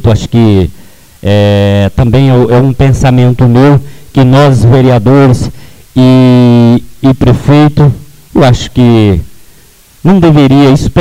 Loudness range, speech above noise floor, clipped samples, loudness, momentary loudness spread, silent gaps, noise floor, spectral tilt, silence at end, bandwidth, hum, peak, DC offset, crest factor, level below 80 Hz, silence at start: 2 LU; 35 dB; 0.7%; -6 LUFS; 7 LU; none; -39 dBFS; -8 dB/octave; 0 s; 12.5 kHz; none; 0 dBFS; under 0.1%; 6 dB; -24 dBFS; 0 s